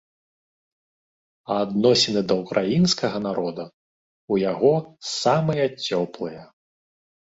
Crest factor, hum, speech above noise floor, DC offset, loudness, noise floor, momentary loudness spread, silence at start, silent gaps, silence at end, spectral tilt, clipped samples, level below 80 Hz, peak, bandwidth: 18 dB; none; over 68 dB; under 0.1%; -22 LUFS; under -90 dBFS; 12 LU; 1.5 s; 3.74-4.28 s; 0.95 s; -5 dB/octave; under 0.1%; -60 dBFS; -6 dBFS; 8 kHz